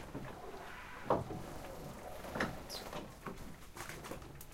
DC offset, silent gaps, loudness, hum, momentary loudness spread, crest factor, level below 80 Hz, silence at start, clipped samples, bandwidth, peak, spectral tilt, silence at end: under 0.1%; none; -44 LUFS; none; 11 LU; 26 dB; -56 dBFS; 0 s; under 0.1%; 16 kHz; -18 dBFS; -4.5 dB/octave; 0 s